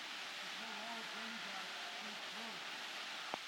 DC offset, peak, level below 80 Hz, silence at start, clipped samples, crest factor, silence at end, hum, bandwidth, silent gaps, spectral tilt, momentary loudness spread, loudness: under 0.1%; -22 dBFS; under -90 dBFS; 0 s; under 0.1%; 24 dB; 0 s; none; 19.5 kHz; none; -1 dB/octave; 1 LU; -45 LUFS